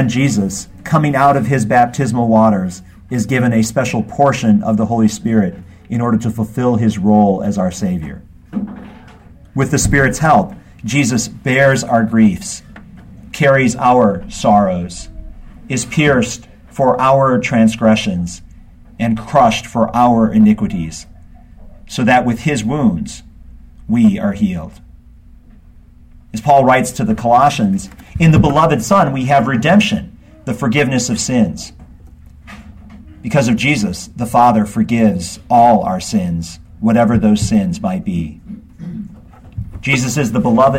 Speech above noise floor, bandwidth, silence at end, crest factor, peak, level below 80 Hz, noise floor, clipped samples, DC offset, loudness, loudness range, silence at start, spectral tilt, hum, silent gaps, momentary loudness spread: 28 dB; 16 kHz; 0 s; 14 dB; 0 dBFS; -36 dBFS; -41 dBFS; under 0.1%; under 0.1%; -14 LUFS; 5 LU; 0 s; -6 dB/octave; none; none; 16 LU